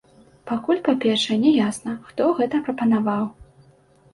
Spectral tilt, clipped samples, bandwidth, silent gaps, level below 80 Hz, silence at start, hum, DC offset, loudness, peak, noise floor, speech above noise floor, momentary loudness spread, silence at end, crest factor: -5 dB/octave; under 0.1%; 11.5 kHz; none; -58 dBFS; 0.45 s; none; under 0.1%; -21 LUFS; -6 dBFS; -55 dBFS; 34 dB; 11 LU; 0.7 s; 16 dB